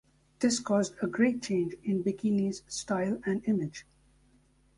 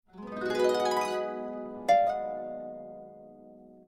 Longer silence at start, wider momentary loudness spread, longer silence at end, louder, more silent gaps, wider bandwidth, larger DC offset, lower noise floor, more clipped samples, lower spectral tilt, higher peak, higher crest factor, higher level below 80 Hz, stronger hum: first, 0.4 s vs 0.15 s; second, 6 LU vs 21 LU; first, 0.95 s vs 0.05 s; about the same, -30 LUFS vs -30 LUFS; neither; second, 11.5 kHz vs 15.5 kHz; neither; first, -65 dBFS vs -52 dBFS; neither; about the same, -5 dB/octave vs -4 dB/octave; about the same, -12 dBFS vs -14 dBFS; about the same, 18 dB vs 18 dB; about the same, -66 dBFS vs -68 dBFS; neither